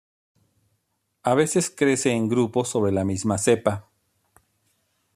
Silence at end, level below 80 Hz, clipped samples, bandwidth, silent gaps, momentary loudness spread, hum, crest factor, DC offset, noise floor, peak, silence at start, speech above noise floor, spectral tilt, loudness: 1.35 s; -64 dBFS; under 0.1%; 14.5 kHz; none; 5 LU; none; 20 dB; under 0.1%; -74 dBFS; -4 dBFS; 1.25 s; 52 dB; -5 dB/octave; -22 LUFS